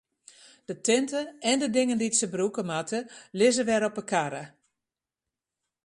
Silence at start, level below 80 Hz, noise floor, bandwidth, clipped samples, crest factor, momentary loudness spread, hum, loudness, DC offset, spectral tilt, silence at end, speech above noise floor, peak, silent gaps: 0.7 s; -72 dBFS; -89 dBFS; 11.5 kHz; under 0.1%; 18 dB; 15 LU; none; -27 LUFS; under 0.1%; -3 dB/octave; 1.4 s; 62 dB; -10 dBFS; none